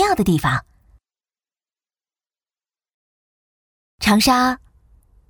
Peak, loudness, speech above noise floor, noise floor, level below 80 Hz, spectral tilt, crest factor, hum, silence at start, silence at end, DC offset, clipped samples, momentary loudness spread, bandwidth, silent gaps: -2 dBFS; -17 LUFS; over 73 dB; under -90 dBFS; -44 dBFS; -4.5 dB/octave; 20 dB; none; 0 s; 0.75 s; under 0.1%; under 0.1%; 10 LU; over 20 kHz; 2.94-3.98 s